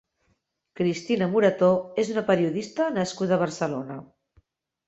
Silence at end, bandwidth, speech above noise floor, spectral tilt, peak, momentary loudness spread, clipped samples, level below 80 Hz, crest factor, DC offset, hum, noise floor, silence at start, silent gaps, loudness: 0.85 s; 8.2 kHz; 48 dB; -6 dB/octave; -8 dBFS; 9 LU; under 0.1%; -66 dBFS; 18 dB; under 0.1%; none; -72 dBFS; 0.8 s; none; -25 LUFS